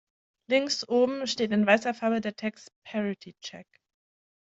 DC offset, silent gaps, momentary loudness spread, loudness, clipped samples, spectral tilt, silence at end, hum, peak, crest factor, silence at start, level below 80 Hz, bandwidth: under 0.1%; 2.76-2.82 s; 16 LU; -27 LUFS; under 0.1%; -4 dB/octave; 0.85 s; none; -6 dBFS; 24 dB; 0.5 s; -74 dBFS; 8 kHz